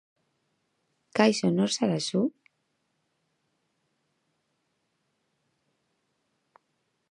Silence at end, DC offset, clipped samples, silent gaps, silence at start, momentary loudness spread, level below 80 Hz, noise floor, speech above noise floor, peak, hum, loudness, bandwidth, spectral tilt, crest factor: 4.85 s; under 0.1%; under 0.1%; none; 1.15 s; 8 LU; -78 dBFS; -77 dBFS; 52 dB; -8 dBFS; none; -26 LUFS; 11 kHz; -5 dB/octave; 26 dB